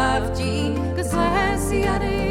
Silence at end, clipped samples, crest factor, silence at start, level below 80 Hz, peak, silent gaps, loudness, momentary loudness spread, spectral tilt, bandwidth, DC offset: 0 s; under 0.1%; 14 dB; 0 s; -30 dBFS; -8 dBFS; none; -22 LUFS; 4 LU; -5.5 dB/octave; 15.5 kHz; under 0.1%